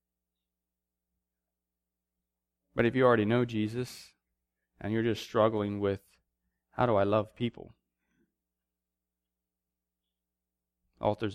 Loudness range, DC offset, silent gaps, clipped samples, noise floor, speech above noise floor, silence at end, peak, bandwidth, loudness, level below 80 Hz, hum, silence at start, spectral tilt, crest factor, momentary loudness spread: 8 LU; under 0.1%; none; under 0.1%; -89 dBFS; 60 dB; 0 s; -12 dBFS; 14.5 kHz; -30 LUFS; -64 dBFS; none; 2.75 s; -7 dB/octave; 22 dB; 15 LU